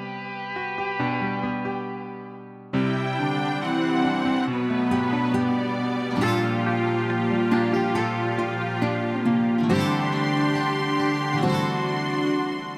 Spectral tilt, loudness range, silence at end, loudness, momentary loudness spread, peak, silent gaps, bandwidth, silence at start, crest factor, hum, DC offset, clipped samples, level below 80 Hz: -6.5 dB/octave; 3 LU; 0 s; -24 LUFS; 8 LU; -10 dBFS; none; 13 kHz; 0 s; 14 dB; none; under 0.1%; under 0.1%; -60 dBFS